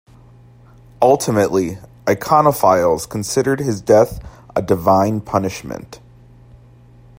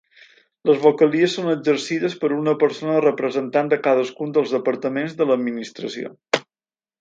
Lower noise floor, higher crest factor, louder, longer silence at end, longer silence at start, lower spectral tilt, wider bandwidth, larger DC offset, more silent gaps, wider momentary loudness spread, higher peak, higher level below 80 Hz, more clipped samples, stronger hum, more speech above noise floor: second, -45 dBFS vs under -90 dBFS; about the same, 18 dB vs 20 dB; first, -16 LUFS vs -20 LUFS; first, 1.2 s vs 0.6 s; first, 1 s vs 0.65 s; about the same, -5.5 dB/octave vs -5.5 dB/octave; first, 16.5 kHz vs 7.8 kHz; neither; neither; first, 11 LU vs 8 LU; about the same, 0 dBFS vs -2 dBFS; first, -46 dBFS vs -72 dBFS; neither; neither; second, 29 dB vs over 70 dB